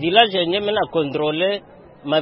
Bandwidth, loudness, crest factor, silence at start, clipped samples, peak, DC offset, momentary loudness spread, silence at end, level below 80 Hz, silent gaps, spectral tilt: 5.8 kHz; -19 LUFS; 20 dB; 0 s; under 0.1%; 0 dBFS; under 0.1%; 9 LU; 0 s; -58 dBFS; none; -7.5 dB/octave